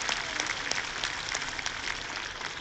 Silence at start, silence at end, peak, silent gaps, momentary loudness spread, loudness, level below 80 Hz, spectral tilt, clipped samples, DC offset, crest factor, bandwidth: 0 s; 0 s; -10 dBFS; none; 5 LU; -32 LUFS; -54 dBFS; -0.5 dB/octave; under 0.1%; under 0.1%; 24 dB; 14 kHz